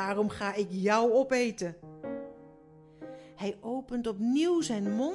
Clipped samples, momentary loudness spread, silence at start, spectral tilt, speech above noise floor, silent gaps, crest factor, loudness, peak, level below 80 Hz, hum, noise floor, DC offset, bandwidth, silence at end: under 0.1%; 20 LU; 0 s; -5 dB/octave; 26 dB; none; 18 dB; -30 LUFS; -14 dBFS; -64 dBFS; none; -55 dBFS; under 0.1%; 11.5 kHz; 0 s